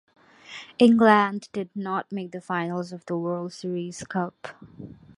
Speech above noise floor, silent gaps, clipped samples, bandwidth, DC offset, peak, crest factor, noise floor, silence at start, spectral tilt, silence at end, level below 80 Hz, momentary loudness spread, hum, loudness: 20 dB; none; under 0.1%; 11 kHz; under 0.1%; -2 dBFS; 22 dB; -45 dBFS; 0.5 s; -6 dB/octave; 0.25 s; -66 dBFS; 24 LU; none; -24 LUFS